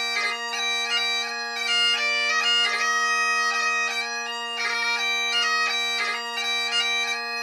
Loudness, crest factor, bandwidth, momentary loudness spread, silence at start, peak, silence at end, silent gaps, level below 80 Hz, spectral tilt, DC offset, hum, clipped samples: -22 LUFS; 14 dB; 16 kHz; 6 LU; 0 s; -12 dBFS; 0 s; none; -80 dBFS; 3 dB/octave; under 0.1%; none; under 0.1%